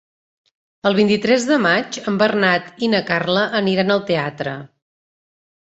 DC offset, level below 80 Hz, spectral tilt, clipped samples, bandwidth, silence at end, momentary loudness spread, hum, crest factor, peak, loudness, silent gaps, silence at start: under 0.1%; -60 dBFS; -5 dB/octave; under 0.1%; 8.2 kHz; 1.15 s; 8 LU; none; 18 dB; -2 dBFS; -18 LUFS; none; 0.85 s